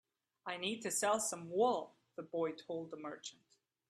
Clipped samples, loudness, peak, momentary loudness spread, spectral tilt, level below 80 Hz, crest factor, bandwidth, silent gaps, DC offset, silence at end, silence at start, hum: under 0.1%; -38 LUFS; -22 dBFS; 17 LU; -2.5 dB/octave; -86 dBFS; 20 dB; 15 kHz; none; under 0.1%; 0.55 s; 0.45 s; none